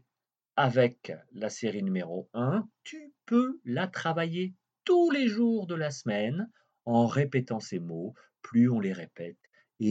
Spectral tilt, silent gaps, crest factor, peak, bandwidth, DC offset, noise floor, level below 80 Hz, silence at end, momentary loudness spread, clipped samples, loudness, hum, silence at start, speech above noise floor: -6.5 dB/octave; none; 18 dB; -10 dBFS; 8 kHz; under 0.1%; -90 dBFS; -80 dBFS; 0 s; 17 LU; under 0.1%; -29 LUFS; none; 0.55 s; 61 dB